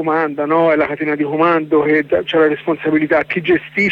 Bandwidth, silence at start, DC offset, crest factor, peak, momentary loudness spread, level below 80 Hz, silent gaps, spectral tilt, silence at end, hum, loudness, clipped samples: 7.2 kHz; 0 s; under 0.1%; 12 dB; -4 dBFS; 4 LU; -54 dBFS; none; -7.5 dB/octave; 0 s; none; -15 LUFS; under 0.1%